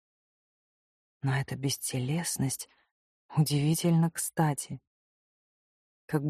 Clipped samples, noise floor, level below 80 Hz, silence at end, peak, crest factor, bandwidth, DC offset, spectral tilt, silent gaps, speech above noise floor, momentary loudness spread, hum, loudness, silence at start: under 0.1%; under -90 dBFS; -64 dBFS; 0 s; -12 dBFS; 18 dB; 15.5 kHz; under 0.1%; -5 dB/octave; 2.91-3.29 s, 4.87-6.08 s; over 61 dB; 10 LU; none; -30 LUFS; 1.25 s